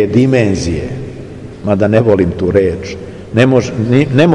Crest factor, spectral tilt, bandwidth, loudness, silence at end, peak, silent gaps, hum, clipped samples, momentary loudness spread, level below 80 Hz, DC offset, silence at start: 12 dB; -7 dB/octave; 10.5 kHz; -12 LUFS; 0 s; 0 dBFS; none; none; under 0.1%; 15 LU; -38 dBFS; 0.2%; 0 s